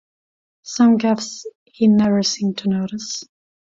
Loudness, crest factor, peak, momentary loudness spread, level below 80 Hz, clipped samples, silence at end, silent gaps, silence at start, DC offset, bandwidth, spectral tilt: -18 LUFS; 14 dB; -6 dBFS; 15 LU; -60 dBFS; under 0.1%; 0.45 s; 1.55-1.66 s; 0.65 s; under 0.1%; 7.8 kHz; -5 dB/octave